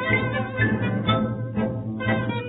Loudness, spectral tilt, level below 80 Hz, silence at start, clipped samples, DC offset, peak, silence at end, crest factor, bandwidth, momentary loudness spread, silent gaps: -24 LUFS; -11.5 dB/octave; -46 dBFS; 0 s; under 0.1%; under 0.1%; -8 dBFS; 0 s; 16 dB; 4 kHz; 4 LU; none